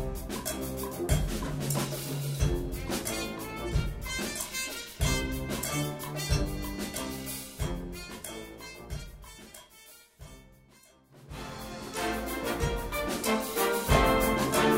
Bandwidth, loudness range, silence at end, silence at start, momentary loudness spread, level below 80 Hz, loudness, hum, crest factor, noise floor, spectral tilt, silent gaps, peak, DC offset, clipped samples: 16 kHz; 14 LU; 0 s; 0 s; 19 LU; -38 dBFS; -32 LUFS; none; 20 dB; -59 dBFS; -4.5 dB/octave; none; -10 dBFS; under 0.1%; under 0.1%